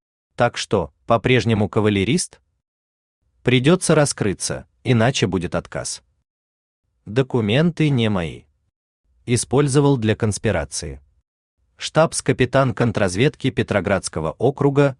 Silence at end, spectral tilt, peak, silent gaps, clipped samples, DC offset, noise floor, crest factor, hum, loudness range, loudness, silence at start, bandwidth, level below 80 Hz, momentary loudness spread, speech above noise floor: 0.05 s; -5.5 dB/octave; -2 dBFS; 2.68-3.22 s, 6.30-6.83 s, 8.76-9.04 s, 11.27-11.57 s; under 0.1%; under 0.1%; under -90 dBFS; 18 dB; none; 3 LU; -19 LUFS; 0.4 s; 12.5 kHz; -48 dBFS; 10 LU; over 71 dB